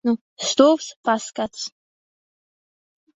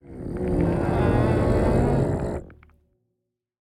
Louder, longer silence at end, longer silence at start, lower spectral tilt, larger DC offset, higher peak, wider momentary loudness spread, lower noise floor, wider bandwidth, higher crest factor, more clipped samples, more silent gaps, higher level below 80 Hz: about the same, -21 LUFS vs -23 LUFS; first, 1.45 s vs 1.25 s; about the same, 0.05 s vs 0.05 s; second, -3 dB/octave vs -9 dB/octave; neither; first, -2 dBFS vs -10 dBFS; first, 14 LU vs 10 LU; first, under -90 dBFS vs -80 dBFS; second, 8.2 kHz vs 12.5 kHz; first, 22 dB vs 14 dB; neither; first, 0.21-0.37 s, 0.96-1.03 s vs none; second, -68 dBFS vs -34 dBFS